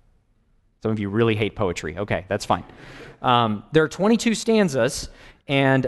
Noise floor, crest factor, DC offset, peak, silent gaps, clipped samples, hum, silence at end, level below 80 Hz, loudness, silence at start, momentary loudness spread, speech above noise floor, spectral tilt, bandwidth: -62 dBFS; 18 dB; under 0.1%; -4 dBFS; none; under 0.1%; none; 0 s; -48 dBFS; -22 LUFS; 0.85 s; 11 LU; 40 dB; -5.5 dB/octave; 12 kHz